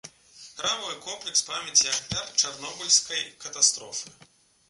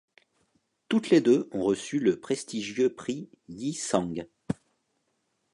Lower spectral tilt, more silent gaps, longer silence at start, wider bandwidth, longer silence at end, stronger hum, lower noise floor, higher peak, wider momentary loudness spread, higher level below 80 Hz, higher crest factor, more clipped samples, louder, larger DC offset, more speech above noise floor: second, 1 dB/octave vs -5 dB/octave; neither; second, 0.05 s vs 0.9 s; about the same, 11.5 kHz vs 11.5 kHz; second, 0.6 s vs 1 s; neither; second, -51 dBFS vs -76 dBFS; first, -4 dBFS vs -8 dBFS; about the same, 14 LU vs 14 LU; about the same, -62 dBFS vs -64 dBFS; about the same, 26 dB vs 22 dB; neither; first, -24 LUFS vs -28 LUFS; neither; second, 23 dB vs 49 dB